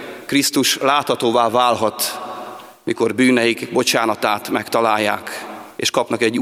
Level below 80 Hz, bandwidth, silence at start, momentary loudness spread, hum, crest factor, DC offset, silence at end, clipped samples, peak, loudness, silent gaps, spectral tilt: -64 dBFS; 16.5 kHz; 0 s; 14 LU; none; 18 dB; under 0.1%; 0 s; under 0.1%; 0 dBFS; -17 LUFS; none; -3 dB/octave